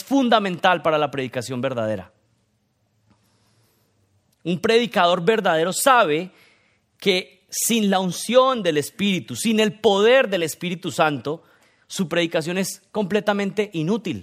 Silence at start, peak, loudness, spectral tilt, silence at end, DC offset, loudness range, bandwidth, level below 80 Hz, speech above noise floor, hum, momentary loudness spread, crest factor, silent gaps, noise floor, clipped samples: 0 s; -2 dBFS; -20 LUFS; -4 dB/octave; 0 s; under 0.1%; 8 LU; 16 kHz; -68 dBFS; 47 dB; none; 11 LU; 20 dB; none; -67 dBFS; under 0.1%